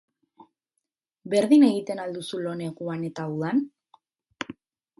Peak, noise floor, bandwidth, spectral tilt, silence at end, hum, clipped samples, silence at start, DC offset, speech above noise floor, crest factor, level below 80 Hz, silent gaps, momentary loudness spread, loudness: -8 dBFS; -82 dBFS; 11.5 kHz; -6.5 dB/octave; 0.5 s; none; under 0.1%; 1.25 s; under 0.1%; 59 dB; 20 dB; -74 dBFS; none; 20 LU; -25 LUFS